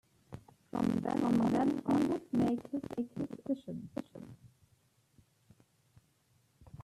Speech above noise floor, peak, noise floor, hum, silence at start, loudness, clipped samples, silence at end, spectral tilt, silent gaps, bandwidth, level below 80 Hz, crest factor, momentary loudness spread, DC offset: 39 dB; -20 dBFS; -72 dBFS; none; 0.3 s; -34 LUFS; under 0.1%; 0 s; -7.5 dB/octave; none; 13 kHz; -66 dBFS; 16 dB; 23 LU; under 0.1%